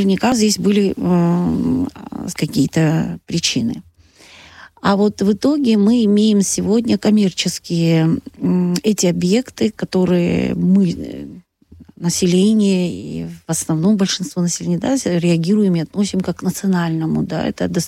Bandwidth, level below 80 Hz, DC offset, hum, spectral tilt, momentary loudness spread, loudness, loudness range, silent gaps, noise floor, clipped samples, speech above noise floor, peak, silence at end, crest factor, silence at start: 15.5 kHz; -48 dBFS; under 0.1%; none; -5.5 dB/octave; 8 LU; -17 LUFS; 3 LU; none; -46 dBFS; under 0.1%; 30 dB; -4 dBFS; 0 s; 14 dB; 0 s